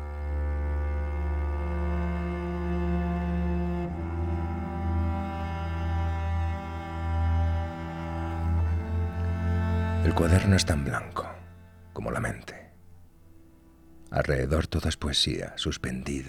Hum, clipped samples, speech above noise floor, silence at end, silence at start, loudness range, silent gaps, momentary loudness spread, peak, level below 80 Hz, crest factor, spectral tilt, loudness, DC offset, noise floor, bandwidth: none; under 0.1%; 27 dB; 0 s; 0 s; 5 LU; none; 9 LU; -8 dBFS; -36 dBFS; 20 dB; -5.5 dB/octave; -29 LUFS; under 0.1%; -54 dBFS; 12.5 kHz